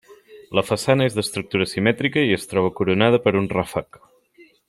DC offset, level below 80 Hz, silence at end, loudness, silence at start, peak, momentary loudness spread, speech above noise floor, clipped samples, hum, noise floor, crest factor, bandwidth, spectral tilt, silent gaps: under 0.1%; -56 dBFS; 0.85 s; -20 LUFS; 0.1 s; -2 dBFS; 7 LU; 33 dB; under 0.1%; none; -53 dBFS; 20 dB; 15.5 kHz; -5.5 dB/octave; none